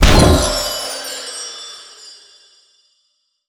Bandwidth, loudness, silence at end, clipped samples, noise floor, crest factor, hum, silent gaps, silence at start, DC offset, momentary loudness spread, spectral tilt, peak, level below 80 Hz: over 20 kHz; -16 LUFS; 1.4 s; under 0.1%; -66 dBFS; 18 dB; none; none; 0 s; under 0.1%; 25 LU; -4 dB/octave; 0 dBFS; -22 dBFS